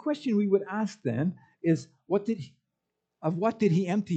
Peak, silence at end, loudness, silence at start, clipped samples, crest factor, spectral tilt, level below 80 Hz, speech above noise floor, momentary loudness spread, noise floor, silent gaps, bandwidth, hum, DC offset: -12 dBFS; 0 s; -29 LUFS; 0.05 s; under 0.1%; 16 dB; -8 dB/octave; -78 dBFS; 56 dB; 8 LU; -84 dBFS; none; 8.4 kHz; none; under 0.1%